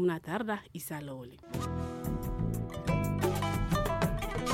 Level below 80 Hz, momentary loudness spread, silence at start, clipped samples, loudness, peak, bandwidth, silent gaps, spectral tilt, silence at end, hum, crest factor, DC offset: -42 dBFS; 9 LU; 0 s; under 0.1%; -34 LUFS; -16 dBFS; 16.5 kHz; none; -6 dB/octave; 0 s; none; 16 dB; under 0.1%